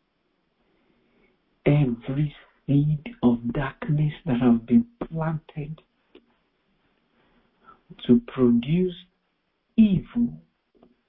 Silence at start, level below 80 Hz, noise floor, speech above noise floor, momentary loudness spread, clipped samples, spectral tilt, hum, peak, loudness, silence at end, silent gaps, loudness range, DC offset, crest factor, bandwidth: 1.65 s; -50 dBFS; -73 dBFS; 51 dB; 14 LU; under 0.1%; -12.5 dB/octave; none; -6 dBFS; -24 LUFS; 0.7 s; none; 6 LU; under 0.1%; 18 dB; 4 kHz